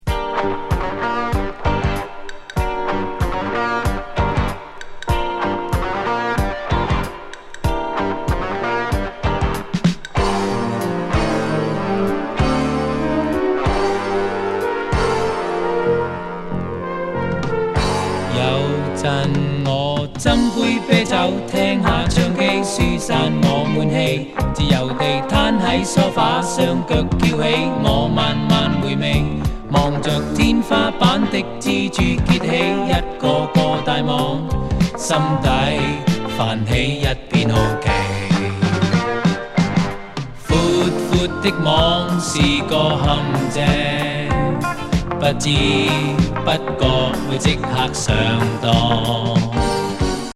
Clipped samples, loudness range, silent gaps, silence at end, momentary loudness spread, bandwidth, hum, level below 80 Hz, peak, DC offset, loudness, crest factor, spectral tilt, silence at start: under 0.1%; 5 LU; none; 0.05 s; 6 LU; 14 kHz; none; -30 dBFS; 0 dBFS; under 0.1%; -18 LUFS; 18 dB; -5.5 dB/octave; 0.05 s